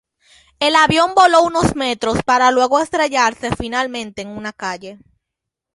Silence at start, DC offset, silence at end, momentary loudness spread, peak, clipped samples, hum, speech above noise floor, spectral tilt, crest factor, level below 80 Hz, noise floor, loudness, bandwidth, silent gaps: 0.6 s; under 0.1%; 0.8 s; 15 LU; -2 dBFS; under 0.1%; none; 66 dB; -4 dB/octave; 16 dB; -42 dBFS; -82 dBFS; -15 LUFS; 11.5 kHz; none